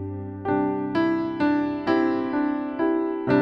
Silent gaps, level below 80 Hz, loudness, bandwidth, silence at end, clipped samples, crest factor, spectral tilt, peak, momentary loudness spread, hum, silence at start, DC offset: none; -58 dBFS; -24 LUFS; 5.8 kHz; 0 s; under 0.1%; 14 dB; -8.5 dB/octave; -8 dBFS; 4 LU; none; 0 s; under 0.1%